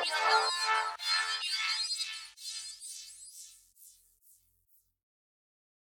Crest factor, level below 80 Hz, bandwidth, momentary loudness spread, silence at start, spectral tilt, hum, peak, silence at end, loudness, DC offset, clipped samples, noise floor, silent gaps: 24 dB; -82 dBFS; over 20 kHz; 20 LU; 0 s; 3.5 dB/octave; none; -12 dBFS; 2 s; -31 LUFS; under 0.1%; under 0.1%; -71 dBFS; none